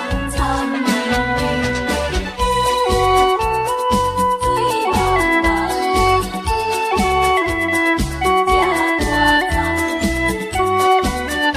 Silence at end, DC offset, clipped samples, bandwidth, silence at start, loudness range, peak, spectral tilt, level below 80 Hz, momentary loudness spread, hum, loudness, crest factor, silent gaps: 0 s; under 0.1%; under 0.1%; 15.5 kHz; 0 s; 1 LU; -2 dBFS; -4.5 dB/octave; -28 dBFS; 5 LU; none; -17 LUFS; 14 dB; none